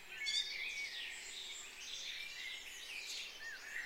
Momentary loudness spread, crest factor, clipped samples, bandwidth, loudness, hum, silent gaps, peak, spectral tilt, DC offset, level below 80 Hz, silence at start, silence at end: 9 LU; 20 dB; under 0.1%; 16 kHz; -43 LUFS; none; none; -26 dBFS; 2 dB/octave; under 0.1%; -72 dBFS; 0 s; 0 s